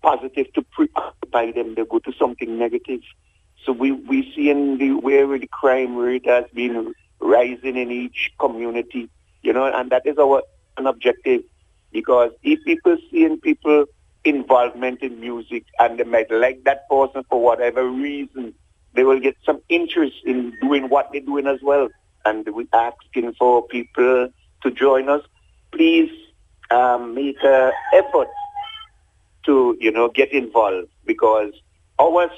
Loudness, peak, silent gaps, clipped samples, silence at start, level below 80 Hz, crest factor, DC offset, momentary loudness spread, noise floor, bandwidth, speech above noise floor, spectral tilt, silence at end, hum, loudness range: -19 LUFS; 0 dBFS; none; under 0.1%; 0.05 s; -58 dBFS; 18 dB; under 0.1%; 11 LU; -57 dBFS; 7.8 kHz; 39 dB; -6 dB/octave; 0 s; none; 3 LU